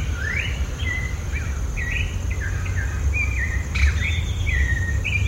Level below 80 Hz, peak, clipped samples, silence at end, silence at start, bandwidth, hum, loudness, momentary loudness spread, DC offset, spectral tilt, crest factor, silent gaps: -24 dBFS; -6 dBFS; under 0.1%; 0 s; 0 s; 15.5 kHz; none; -24 LUFS; 5 LU; under 0.1%; -4.5 dB/octave; 16 dB; none